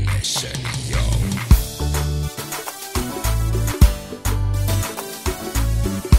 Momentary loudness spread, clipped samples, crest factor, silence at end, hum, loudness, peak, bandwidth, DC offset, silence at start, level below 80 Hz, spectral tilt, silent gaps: 8 LU; under 0.1%; 18 dB; 0 s; none; -22 LUFS; 0 dBFS; 16.5 kHz; 0.2%; 0 s; -22 dBFS; -4.5 dB/octave; none